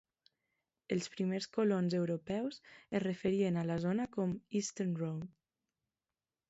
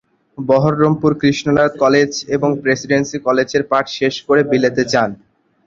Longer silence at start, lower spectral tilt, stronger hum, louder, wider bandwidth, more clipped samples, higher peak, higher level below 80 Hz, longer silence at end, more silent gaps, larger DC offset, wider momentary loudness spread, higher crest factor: first, 0.9 s vs 0.4 s; first, -7 dB/octave vs -5.5 dB/octave; neither; second, -36 LUFS vs -15 LUFS; about the same, 8 kHz vs 7.6 kHz; neither; second, -22 dBFS vs 0 dBFS; second, -72 dBFS vs -52 dBFS; first, 1.2 s vs 0.5 s; neither; neither; about the same, 7 LU vs 5 LU; about the same, 16 dB vs 14 dB